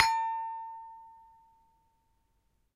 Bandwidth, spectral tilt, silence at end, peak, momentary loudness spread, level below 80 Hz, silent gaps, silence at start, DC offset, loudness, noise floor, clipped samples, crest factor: 15.5 kHz; 1 dB/octave; 1.55 s; -4 dBFS; 23 LU; -72 dBFS; none; 0 s; under 0.1%; -33 LUFS; -74 dBFS; under 0.1%; 32 dB